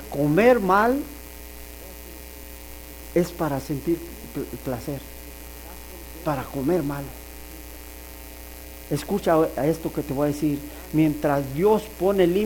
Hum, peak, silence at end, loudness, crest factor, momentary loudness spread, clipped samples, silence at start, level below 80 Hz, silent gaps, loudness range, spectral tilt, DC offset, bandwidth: none; -6 dBFS; 0 s; -24 LUFS; 18 dB; 20 LU; under 0.1%; 0 s; -44 dBFS; none; 7 LU; -6.5 dB/octave; under 0.1%; 19 kHz